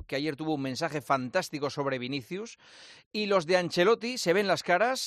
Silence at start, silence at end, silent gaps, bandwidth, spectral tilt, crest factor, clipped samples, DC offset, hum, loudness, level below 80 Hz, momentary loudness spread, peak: 0 s; 0 s; 3.06-3.11 s; 14 kHz; -4.5 dB/octave; 18 dB; under 0.1%; under 0.1%; none; -29 LUFS; -70 dBFS; 10 LU; -10 dBFS